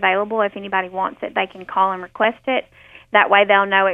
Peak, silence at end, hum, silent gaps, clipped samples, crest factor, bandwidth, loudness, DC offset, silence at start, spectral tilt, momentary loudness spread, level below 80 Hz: -2 dBFS; 0 s; none; none; under 0.1%; 18 dB; 3.9 kHz; -18 LUFS; under 0.1%; 0 s; -6.5 dB/octave; 10 LU; -62 dBFS